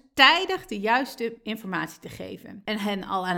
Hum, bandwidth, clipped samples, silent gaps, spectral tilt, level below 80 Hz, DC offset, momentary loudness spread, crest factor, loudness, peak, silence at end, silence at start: none; 19 kHz; under 0.1%; none; -3.5 dB/octave; -60 dBFS; under 0.1%; 21 LU; 24 dB; -24 LUFS; -2 dBFS; 0 s; 0.15 s